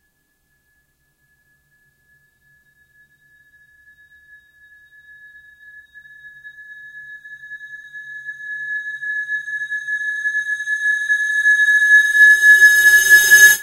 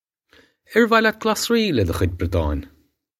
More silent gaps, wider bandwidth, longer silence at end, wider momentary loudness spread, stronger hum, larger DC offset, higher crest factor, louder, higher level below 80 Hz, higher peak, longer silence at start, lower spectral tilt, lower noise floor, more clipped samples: neither; about the same, 16 kHz vs 16 kHz; second, 0 s vs 0.5 s; first, 27 LU vs 7 LU; neither; neither; about the same, 18 dB vs 20 dB; first, -12 LUFS vs -20 LUFS; second, -62 dBFS vs -36 dBFS; about the same, 0 dBFS vs -2 dBFS; first, 6.25 s vs 0.7 s; second, 3 dB/octave vs -5 dB/octave; first, -65 dBFS vs -56 dBFS; neither